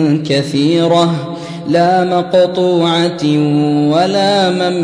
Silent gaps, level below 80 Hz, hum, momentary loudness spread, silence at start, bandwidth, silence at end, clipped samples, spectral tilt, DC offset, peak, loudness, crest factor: none; -54 dBFS; none; 4 LU; 0 s; 10.5 kHz; 0 s; under 0.1%; -6 dB/octave; under 0.1%; 0 dBFS; -12 LUFS; 12 dB